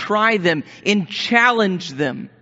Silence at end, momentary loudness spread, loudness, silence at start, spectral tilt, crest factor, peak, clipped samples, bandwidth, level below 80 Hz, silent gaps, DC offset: 0.15 s; 9 LU; -18 LUFS; 0 s; -2.5 dB/octave; 18 dB; 0 dBFS; under 0.1%; 8 kHz; -64 dBFS; none; under 0.1%